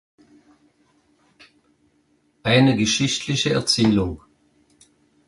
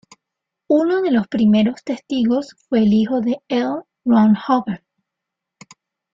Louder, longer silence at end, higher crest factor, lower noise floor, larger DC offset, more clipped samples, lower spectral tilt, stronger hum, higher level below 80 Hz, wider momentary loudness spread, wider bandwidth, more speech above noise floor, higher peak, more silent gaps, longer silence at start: about the same, -19 LUFS vs -18 LUFS; second, 1.1 s vs 1.35 s; first, 20 dB vs 14 dB; second, -64 dBFS vs -82 dBFS; neither; neither; second, -4.5 dB/octave vs -7.5 dB/octave; neither; first, -48 dBFS vs -58 dBFS; first, 12 LU vs 9 LU; first, 11.5 kHz vs 7.6 kHz; second, 45 dB vs 66 dB; about the same, -4 dBFS vs -4 dBFS; neither; first, 2.45 s vs 0.7 s